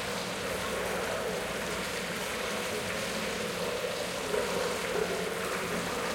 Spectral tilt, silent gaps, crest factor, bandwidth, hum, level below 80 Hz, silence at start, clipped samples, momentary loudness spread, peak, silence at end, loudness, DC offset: -3 dB/octave; none; 16 dB; 17 kHz; none; -56 dBFS; 0 s; under 0.1%; 2 LU; -18 dBFS; 0 s; -32 LUFS; under 0.1%